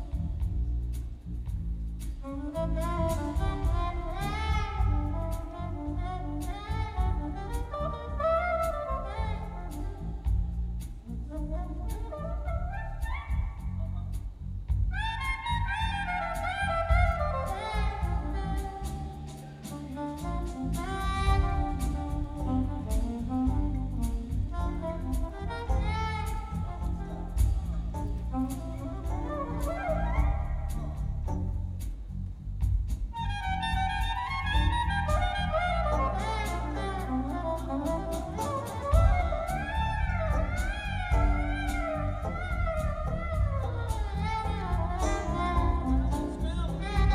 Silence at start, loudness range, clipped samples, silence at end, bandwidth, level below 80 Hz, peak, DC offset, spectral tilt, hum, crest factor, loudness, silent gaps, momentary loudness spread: 0 s; 5 LU; under 0.1%; 0 s; 14.5 kHz; -32 dBFS; -12 dBFS; under 0.1%; -6.5 dB/octave; none; 18 dB; -32 LUFS; none; 9 LU